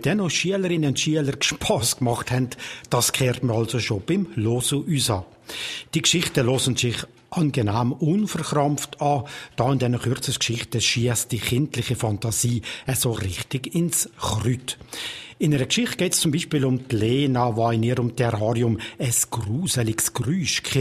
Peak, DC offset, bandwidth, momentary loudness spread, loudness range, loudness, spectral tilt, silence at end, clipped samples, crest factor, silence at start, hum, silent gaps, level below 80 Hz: -2 dBFS; under 0.1%; 15 kHz; 6 LU; 2 LU; -23 LUFS; -4 dB/octave; 0 s; under 0.1%; 22 dB; 0 s; none; none; -50 dBFS